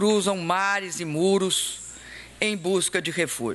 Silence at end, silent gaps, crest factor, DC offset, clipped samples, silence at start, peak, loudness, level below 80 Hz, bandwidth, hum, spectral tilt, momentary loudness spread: 0 s; none; 20 dB; under 0.1%; under 0.1%; 0 s; -6 dBFS; -24 LUFS; -60 dBFS; 12.5 kHz; none; -3 dB/octave; 13 LU